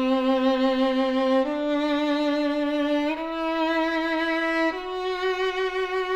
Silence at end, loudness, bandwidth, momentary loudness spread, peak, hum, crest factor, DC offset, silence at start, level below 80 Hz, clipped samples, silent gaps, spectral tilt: 0 s; -24 LUFS; 10 kHz; 5 LU; -12 dBFS; none; 12 dB; under 0.1%; 0 s; -54 dBFS; under 0.1%; none; -4 dB/octave